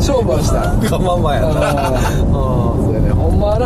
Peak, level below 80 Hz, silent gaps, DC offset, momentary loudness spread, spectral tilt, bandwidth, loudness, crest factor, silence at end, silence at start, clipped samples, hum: -4 dBFS; -20 dBFS; none; under 0.1%; 1 LU; -6.5 dB/octave; 14 kHz; -15 LUFS; 10 dB; 0 s; 0 s; under 0.1%; none